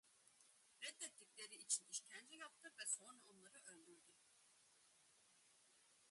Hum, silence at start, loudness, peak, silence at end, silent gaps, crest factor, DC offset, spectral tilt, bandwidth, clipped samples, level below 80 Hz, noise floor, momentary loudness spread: none; 0.05 s; -50 LUFS; -28 dBFS; 0 s; none; 28 dB; under 0.1%; 1.5 dB/octave; 11.5 kHz; under 0.1%; under -90 dBFS; -75 dBFS; 20 LU